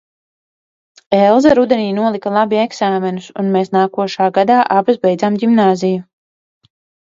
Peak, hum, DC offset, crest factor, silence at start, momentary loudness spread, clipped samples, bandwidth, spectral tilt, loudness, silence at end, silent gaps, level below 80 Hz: 0 dBFS; none; under 0.1%; 14 dB; 1.1 s; 7 LU; under 0.1%; 7.8 kHz; -6.5 dB/octave; -14 LUFS; 1 s; none; -54 dBFS